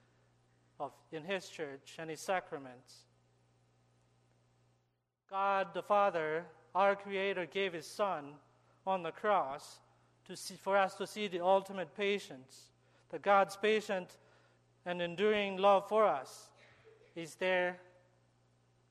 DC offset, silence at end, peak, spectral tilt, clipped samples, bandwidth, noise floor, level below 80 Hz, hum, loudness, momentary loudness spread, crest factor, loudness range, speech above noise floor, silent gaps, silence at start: under 0.1%; 1.1 s; -16 dBFS; -4 dB/octave; under 0.1%; 13 kHz; -81 dBFS; -82 dBFS; 60 Hz at -70 dBFS; -35 LUFS; 18 LU; 22 dB; 10 LU; 46 dB; none; 0.8 s